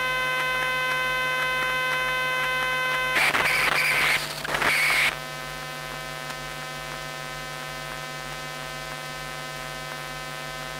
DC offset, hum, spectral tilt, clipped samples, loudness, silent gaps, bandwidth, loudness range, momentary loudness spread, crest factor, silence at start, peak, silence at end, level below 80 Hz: under 0.1%; none; -2 dB/octave; under 0.1%; -25 LUFS; none; 16 kHz; 11 LU; 13 LU; 16 dB; 0 s; -10 dBFS; 0 s; -52 dBFS